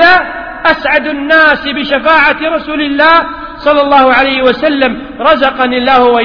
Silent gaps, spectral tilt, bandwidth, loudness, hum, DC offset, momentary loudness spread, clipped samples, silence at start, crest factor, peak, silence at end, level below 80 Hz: none; -5.5 dB/octave; 5.4 kHz; -9 LUFS; none; under 0.1%; 7 LU; 0.7%; 0 s; 8 dB; 0 dBFS; 0 s; -36 dBFS